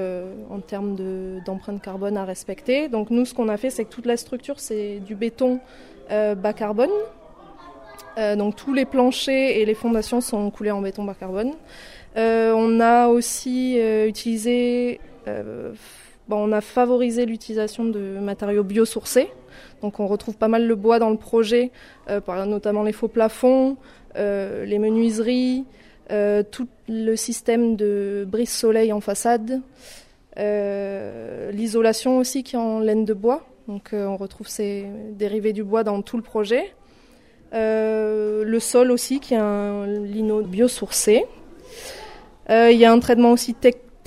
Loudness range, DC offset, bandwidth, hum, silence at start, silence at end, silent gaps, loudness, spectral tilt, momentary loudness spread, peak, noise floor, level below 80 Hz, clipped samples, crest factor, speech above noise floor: 5 LU; under 0.1%; 15 kHz; none; 0 s; 0.3 s; none; -21 LUFS; -4.5 dB/octave; 14 LU; 0 dBFS; -51 dBFS; -52 dBFS; under 0.1%; 20 dB; 30 dB